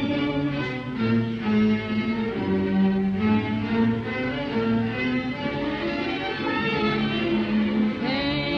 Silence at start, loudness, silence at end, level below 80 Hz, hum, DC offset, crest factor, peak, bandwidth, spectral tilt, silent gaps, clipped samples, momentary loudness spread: 0 s; -24 LUFS; 0 s; -48 dBFS; none; under 0.1%; 14 dB; -10 dBFS; 6.4 kHz; -8 dB/octave; none; under 0.1%; 5 LU